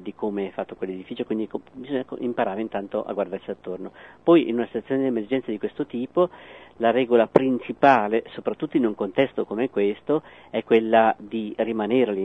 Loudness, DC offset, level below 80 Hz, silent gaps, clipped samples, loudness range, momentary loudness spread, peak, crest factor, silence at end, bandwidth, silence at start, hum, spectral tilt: -24 LUFS; under 0.1%; -64 dBFS; none; under 0.1%; 7 LU; 13 LU; 0 dBFS; 24 dB; 0 s; 6 kHz; 0 s; none; -8 dB/octave